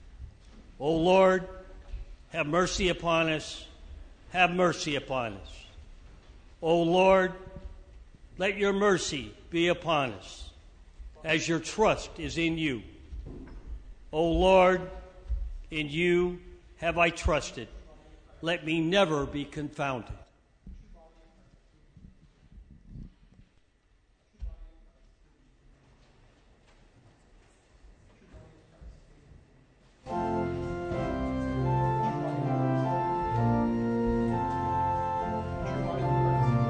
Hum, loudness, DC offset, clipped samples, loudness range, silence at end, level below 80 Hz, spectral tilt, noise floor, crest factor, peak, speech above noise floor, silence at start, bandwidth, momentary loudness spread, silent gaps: none; -28 LUFS; under 0.1%; under 0.1%; 6 LU; 0 s; -46 dBFS; -5.5 dB/octave; -65 dBFS; 22 dB; -8 dBFS; 39 dB; 0 s; 9.6 kHz; 22 LU; none